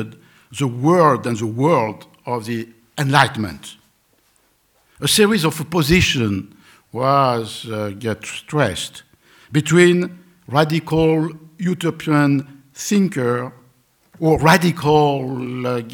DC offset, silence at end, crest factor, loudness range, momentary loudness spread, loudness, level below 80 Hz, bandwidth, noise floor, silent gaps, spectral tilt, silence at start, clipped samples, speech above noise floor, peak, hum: under 0.1%; 0 s; 18 dB; 3 LU; 14 LU; -18 LUFS; -44 dBFS; 19.5 kHz; -60 dBFS; none; -5 dB/octave; 0 s; under 0.1%; 43 dB; 0 dBFS; none